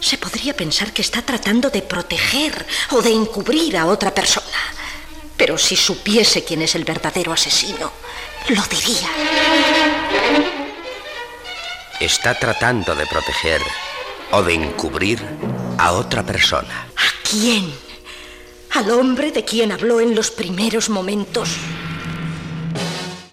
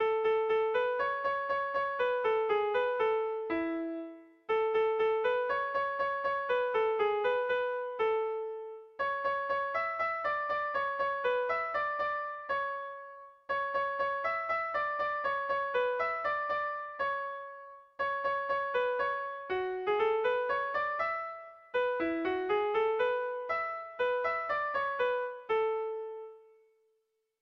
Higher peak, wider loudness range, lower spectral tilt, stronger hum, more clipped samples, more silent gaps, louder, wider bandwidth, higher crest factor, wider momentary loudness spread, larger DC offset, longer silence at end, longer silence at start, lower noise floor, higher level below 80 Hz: first, -2 dBFS vs -20 dBFS; about the same, 3 LU vs 3 LU; second, -3 dB/octave vs -5.5 dB/octave; neither; neither; neither; first, -17 LUFS vs -32 LUFS; first, 16 kHz vs 6 kHz; about the same, 16 dB vs 14 dB; first, 13 LU vs 8 LU; neither; second, 0.05 s vs 1 s; about the same, 0 s vs 0 s; second, -38 dBFS vs -79 dBFS; first, -42 dBFS vs -70 dBFS